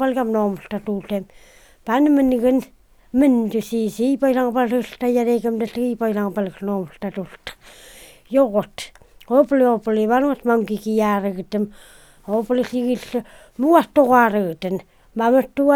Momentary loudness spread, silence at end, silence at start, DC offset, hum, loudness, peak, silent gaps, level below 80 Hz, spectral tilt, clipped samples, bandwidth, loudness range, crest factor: 14 LU; 0 s; 0 s; under 0.1%; none; -20 LUFS; 0 dBFS; none; -52 dBFS; -6.5 dB/octave; under 0.1%; 18 kHz; 5 LU; 20 dB